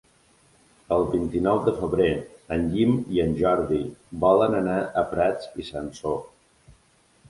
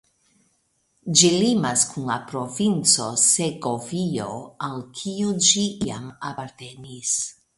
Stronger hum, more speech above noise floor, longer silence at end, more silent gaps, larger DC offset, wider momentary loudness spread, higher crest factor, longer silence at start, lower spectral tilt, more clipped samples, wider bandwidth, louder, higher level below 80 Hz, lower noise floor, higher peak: neither; second, 37 dB vs 45 dB; first, 0.6 s vs 0.25 s; neither; neither; second, 12 LU vs 16 LU; about the same, 20 dB vs 22 dB; second, 0.9 s vs 1.05 s; first, -7.5 dB/octave vs -3 dB/octave; neither; about the same, 11.5 kHz vs 11.5 kHz; second, -24 LUFS vs -21 LUFS; first, -46 dBFS vs -60 dBFS; second, -61 dBFS vs -68 dBFS; second, -6 dBFS vs -2 dBFS